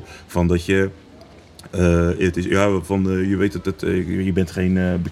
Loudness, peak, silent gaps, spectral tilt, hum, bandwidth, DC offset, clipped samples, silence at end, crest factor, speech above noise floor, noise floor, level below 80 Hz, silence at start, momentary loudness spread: -20 LUFS; 0 dBFS; none; -7 dB/octave; none; 13.5 kHz; under 0.1%; under 0.1%; 0 s; 20 dB; 25 dB; -44 dBFS; -38 dBFS; 0 s; 5 LU